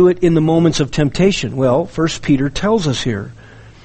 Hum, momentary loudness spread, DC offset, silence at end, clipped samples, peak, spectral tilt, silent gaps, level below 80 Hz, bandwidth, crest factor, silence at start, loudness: none; 7 LU; under 0.1%; 0.15 s; under 0.1%; -2 dBFS; -6 dB/octave; none; -34 dBFS; 8.8 kHz; 14 dB; 0 s; -16 LUFS